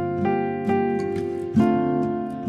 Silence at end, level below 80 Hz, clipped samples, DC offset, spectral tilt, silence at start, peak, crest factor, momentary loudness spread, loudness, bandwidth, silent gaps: 0 s; -54 dBFS; under 0.1%; under 0.1%; -9 dB/octave; 0 s; -8 dBFS; 14 dB; 6 LU; -23 LUFS; 9.4 kHz; none